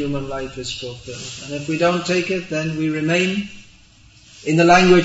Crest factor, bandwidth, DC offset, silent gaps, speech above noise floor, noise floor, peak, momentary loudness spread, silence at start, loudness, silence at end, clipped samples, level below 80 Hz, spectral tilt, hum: 18 dB; 8 kHz; under 0.1%; none; 30 dB; -49 dBFS; 0 dBFS; 17 LU; 0 s; -19 LUFS; 0 s; under 0.1%; -46 dBFS; -5 dB/octave; none